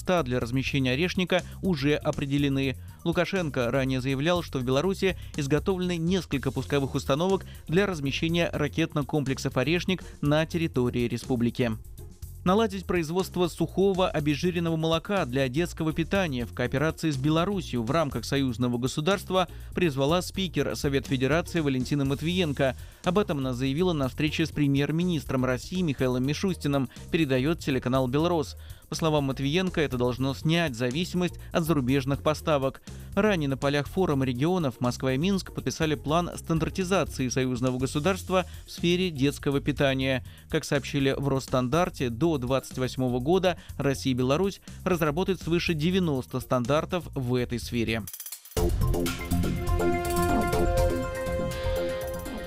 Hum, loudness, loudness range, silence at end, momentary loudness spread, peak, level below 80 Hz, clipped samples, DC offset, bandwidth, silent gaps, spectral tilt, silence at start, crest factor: none; -27 LUFS; 1 LU; 0 s; 5 LU; -10 dBFS; -42 dBFS; under 0.1%; under 0.1%; 16 kHz; none; -6 dB/octave; 0 s; 18 dB